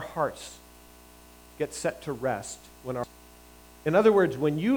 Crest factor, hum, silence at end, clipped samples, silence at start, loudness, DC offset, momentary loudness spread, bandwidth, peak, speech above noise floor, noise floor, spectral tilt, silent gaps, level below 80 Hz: 20 dB; 60 Hz at -55 dBFS; 0 s; under 0.1%; 0 s; -27 LUFS; under 0.1%; 19 LU; over 20 kHz; -8 dBFS; 25 dB; -52 dBFS; -5.5 dB/octave; none; -58 dBFS